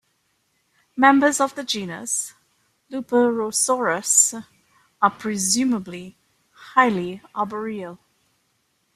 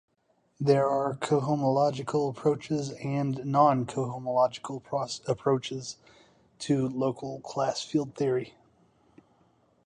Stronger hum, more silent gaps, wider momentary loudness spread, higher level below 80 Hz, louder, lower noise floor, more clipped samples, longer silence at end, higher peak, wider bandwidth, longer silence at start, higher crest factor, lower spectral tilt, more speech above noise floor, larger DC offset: neither; neither; first, 18 LU vs 12 LU; about the same, -68 dBFS vs -68 dBFS; first, -20 LUFS vs -28 LUFS; about the same, -69 dBFS vs -71 dBFS; neither; second, 1 s vs 1.35 s; first, -2 dBFS vs -8 dBFS; first, 15.5 kHz vs 10.5 kHz; first, 0.95 s vs 0.6 s; about the same, 22 dB vs 20 dB; second, -2.5 dB/octave vs -6.5 dB/octave; first, 48 dB vs 43 dB; neither